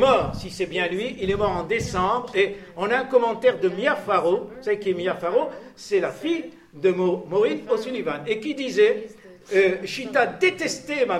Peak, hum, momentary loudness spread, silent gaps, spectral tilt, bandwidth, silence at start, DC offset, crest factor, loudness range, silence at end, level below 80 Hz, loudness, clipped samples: -6 dBFS; none; 8 LU; none; -5 dB/octave; 13 kHz; 0 s; under 0.1%; 18 dB; 2 LU; 0 s; -50 dBFS; -23 LUFS; under 0.1%